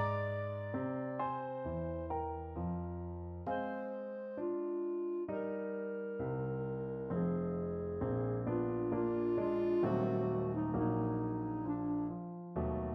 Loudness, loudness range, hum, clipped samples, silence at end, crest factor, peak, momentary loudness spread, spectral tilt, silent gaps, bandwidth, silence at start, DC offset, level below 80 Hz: -38 LUFS; 5 LU; none; under 0.1%; 0 s; 16 dB; -22 dBFS; 7 LU; -11 dB/octave; none; 5 kHz; 0 s; under 0.1%; -56 dBFS